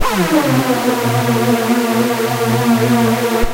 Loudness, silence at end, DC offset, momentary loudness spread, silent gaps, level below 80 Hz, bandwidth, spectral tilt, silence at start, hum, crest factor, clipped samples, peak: -14 LUFS; 0 s; under 0.1%; 2 LU; none; -32 dBFS; 16 kHz; -5.5 dB/octave; 0 s; none; 14 dB; under 0.1%; 0 dBFS